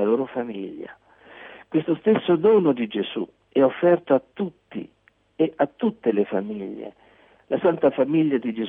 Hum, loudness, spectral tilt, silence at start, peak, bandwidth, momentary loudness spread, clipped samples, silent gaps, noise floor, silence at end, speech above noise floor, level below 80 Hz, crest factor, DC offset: none; -22 LUFS; -10 dB/octave; 0 s; -8 dBFS; 3.8 kHz; 18 LU; under 0.1%; none; -51 dBFS; 0 s; 29 dB; -66 dBFS; 16 dB; under 0.1%